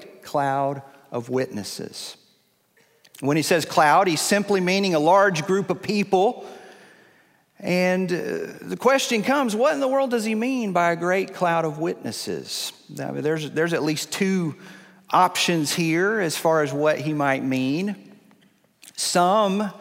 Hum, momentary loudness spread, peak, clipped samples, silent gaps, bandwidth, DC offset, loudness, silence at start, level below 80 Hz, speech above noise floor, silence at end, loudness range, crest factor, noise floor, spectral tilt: none; 13 LU; -4 dBFS; under 0.1%; none; 16 kHz; under 0.1%; -22 LUFS; 0 s; -70 dBFS; 41 dB; 0 s; 5 LU; 20 dB; -63 dBFS; -4.5 dB/octave